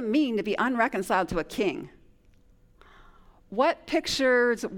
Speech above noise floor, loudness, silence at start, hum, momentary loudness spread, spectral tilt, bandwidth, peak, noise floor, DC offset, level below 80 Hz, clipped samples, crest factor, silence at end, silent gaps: 32 dB; -26 LUFS; 0 s; none; 8 LU; -4 dB/octave; 18 kHz; -10 dBFS; -58 dBFS; under 0.1%; -52 dBFS; under 0.1%; 18 dB; 0 s; none